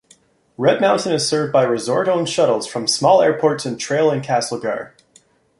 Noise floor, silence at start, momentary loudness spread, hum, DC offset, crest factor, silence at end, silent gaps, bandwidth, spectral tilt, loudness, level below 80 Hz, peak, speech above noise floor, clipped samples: -55 dBFS; 0.6 s; 9 LU; none; under 0.1%; 16 dB; 0.7 s; none; 11.5 kHz; -4 dB/octave; -17 LUFS; -62 dBFS; -2 dBFS; 37 dB; under 0.1%